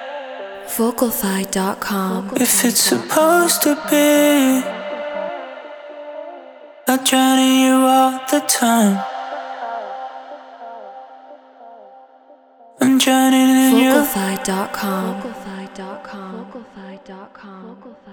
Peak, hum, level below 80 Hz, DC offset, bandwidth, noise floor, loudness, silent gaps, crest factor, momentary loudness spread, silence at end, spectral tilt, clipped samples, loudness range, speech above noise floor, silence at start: -2 dBFS; none; -58 dBFS; under 0.1%; over 20 kHz; -48 dBFS; -16 LUFS; none; 16 dB; 23 LU; 0 s; -3 dB/octave; under 0.1%; 13 LU; 31 dB; 0 s